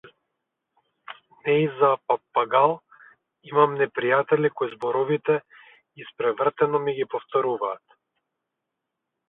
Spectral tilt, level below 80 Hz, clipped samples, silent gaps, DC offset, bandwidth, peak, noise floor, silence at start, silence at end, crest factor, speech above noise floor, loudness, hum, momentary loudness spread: -8.5 dB/octave; -74 dBFS; under 0.1%; none; under 0.1%; 4 kHz; -4 dBFS; -83 dBFS; 1.1 s; 1.5 s; 20 dB; 60 dB; -23 LUFS; none; 14 LU